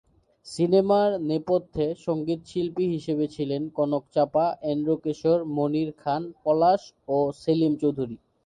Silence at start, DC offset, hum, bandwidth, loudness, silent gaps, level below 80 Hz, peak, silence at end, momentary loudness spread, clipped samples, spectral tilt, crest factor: 0.45 s; under 0.1%; none; 10.5 kHz; -25 LUFS; none; -60 dBFS; -8 dBFS; 0.3 s; 7 LU; under 0.1%; -7.5 dB/octave; 16 dB